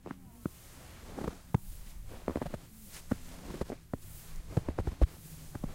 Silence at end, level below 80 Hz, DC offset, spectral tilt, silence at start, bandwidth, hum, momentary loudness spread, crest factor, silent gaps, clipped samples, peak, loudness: 0 s; -42 dBFS; under 0.1%; -7 dB/octave; 0 s; 16 kHz; none; 16 LU; 24 dB; none; under 0.1%; -12 dBFS; -39 LUFS